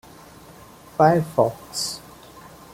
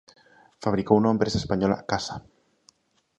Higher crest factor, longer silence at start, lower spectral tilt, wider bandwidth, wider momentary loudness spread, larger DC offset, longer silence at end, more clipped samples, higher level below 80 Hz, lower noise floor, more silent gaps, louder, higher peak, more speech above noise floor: about the same, 22 dB vs 22 dB; first, 1 s vs 0.6 s; about the same, -5 dB/octave vs -6 dB/octave; first, 16.5 kHz vs 8.6 kHz; first, 22 LU vs 11 LU; neither; second, 0.75 s vs 1 s; neither; second, -56 dBFS vs -50 dBFS; second, -46 dBFS vs -62 dBFS; neither; first, -21 LUFS vs -25 LUFS; about the same, -2 dBFS vs -4 dBFS; second, 26 dB vs 39 dB